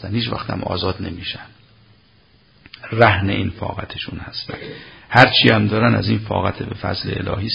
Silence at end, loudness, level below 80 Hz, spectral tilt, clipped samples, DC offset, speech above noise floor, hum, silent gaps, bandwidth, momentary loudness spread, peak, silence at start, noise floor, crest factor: 0 s; -18 LUFS; -40 dBFS; -7 dB/octave; under 0.1%; under 0.1%; 35 dB; none; none; 8 kHz; 16 LU; 0 dBFS; 0 s; -54 dBFS; 20 dB